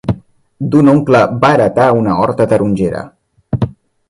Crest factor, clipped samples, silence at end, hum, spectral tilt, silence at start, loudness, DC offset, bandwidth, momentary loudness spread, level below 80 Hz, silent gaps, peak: 12 dB; under 0.1%; 0.4 s; none; -8 dB/octave; 0.05 s; -12 LUFS; under 0.1%; 11.5 kHz; 14 LU; -40 dBFS; none; 0 dBFS